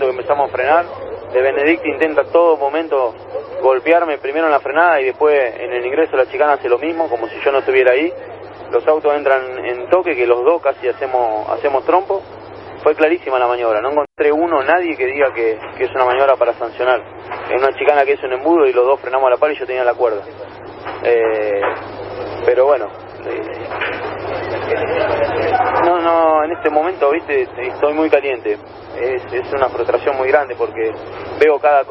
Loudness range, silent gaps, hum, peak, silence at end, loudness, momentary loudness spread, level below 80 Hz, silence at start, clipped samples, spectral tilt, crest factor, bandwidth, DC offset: 3 LU; none; none; 0 dBFS; 0 s; -16 LUFS; 11 LU; -52 dBFS; 0 s; under 0.1%; -7.5 dB/octave; 16 dB; 5.8 kHz; under 0.1%